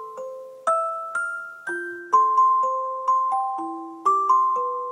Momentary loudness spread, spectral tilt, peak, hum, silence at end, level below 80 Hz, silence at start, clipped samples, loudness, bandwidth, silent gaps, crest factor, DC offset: 13 LU; -3 dB/octave; -8 dBFS; none; 0 s; -90 dBFS; 0 s; under 0.1%; -22 LUFS; 10.5 kHz; none; 14 dB; under 0.1%